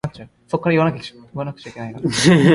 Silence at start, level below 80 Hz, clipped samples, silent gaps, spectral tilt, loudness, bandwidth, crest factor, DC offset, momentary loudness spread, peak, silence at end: 0.05 s; -50 dBFS; under 0.1%; none; -5.5 dB/octave; -19 LUFS; 11.5 kHz; 18 dB; under 0.1%; 18 LU; 0 dBFS; 0 s